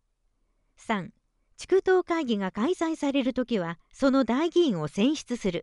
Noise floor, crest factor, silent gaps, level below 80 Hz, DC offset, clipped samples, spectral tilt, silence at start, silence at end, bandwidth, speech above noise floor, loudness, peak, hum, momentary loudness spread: -72 dBFS; 16 dB; none; -58 dBFS; under 0.1%; under 0.1%; -5.5 dB/octave; 0.9 s; 0 s; 11.5 kHz; 46 dB; -26 LUFS; -10 dBFS; none; 8 LU